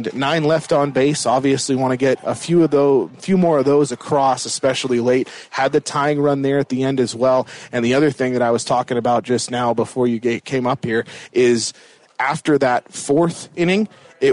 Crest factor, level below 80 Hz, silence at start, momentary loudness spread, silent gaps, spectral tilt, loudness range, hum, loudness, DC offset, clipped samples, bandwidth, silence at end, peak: 12 dB; -58 dBFS; 0 s; 6 LU; none; -5 dB/octave; 2 LU; none; -18 LUFS; under 0.1%; under 0.1%; 11 kHz; 0 s; -6 dBFS